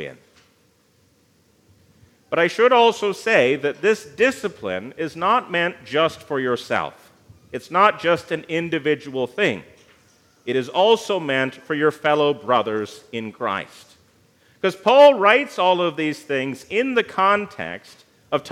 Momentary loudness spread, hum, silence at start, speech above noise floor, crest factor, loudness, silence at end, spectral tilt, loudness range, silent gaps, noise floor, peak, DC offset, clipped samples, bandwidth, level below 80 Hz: 13 LU; none; 0 s; 40 dB; 20 dB; -20 LUFS; 0 s; -4.5 dB/octave; 5 LU; none; -60 dBFS; 0 dBFS; under 0.1%; under 0.1%; 14.5 kHz; -68 dBFS